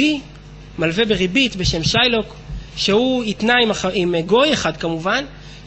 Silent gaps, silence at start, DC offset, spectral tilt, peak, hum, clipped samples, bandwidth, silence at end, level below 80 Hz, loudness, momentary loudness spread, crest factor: none; 0 s; under 0.1%; -4 dB/octave; -2 dBFS; none; under 0.1%; 8.4 kHz; 0 s; -38 dBFS; -17 LUFS; 11 LU; 16 dB